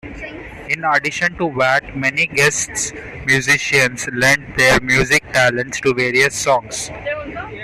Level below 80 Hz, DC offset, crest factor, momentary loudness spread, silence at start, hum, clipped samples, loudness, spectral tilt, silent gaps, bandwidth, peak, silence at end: -42 dBFS; under 0.1%; 16 dB; 12 LU; 0.05 s; none; under 0.1%; -16 LUFS; -3 dB/octave; none; 15 kHz; -2 dBFS; 0 s